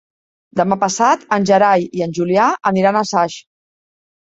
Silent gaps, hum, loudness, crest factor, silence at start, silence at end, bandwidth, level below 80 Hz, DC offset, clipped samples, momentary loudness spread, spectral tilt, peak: none; none; -15 LUFS; 16 dB; 0.55 s; 0.9 s; 8 kHz; -60 dBFS; under 0.1%; under 0.1%; 9 LU; -5 dB/octave; -2 dBFS